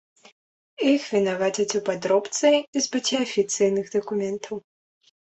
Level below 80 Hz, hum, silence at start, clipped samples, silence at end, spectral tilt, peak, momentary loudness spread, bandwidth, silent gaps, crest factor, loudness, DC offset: -68 dBFS; none; 0.8 s; under 0.1%; 0.65 s; -3.5 dB/octave; -8 dBFS; 7 LU; 8.4 kHz; 2.68-2.73 s; 18 dB; -23 LUFS; under 0.1%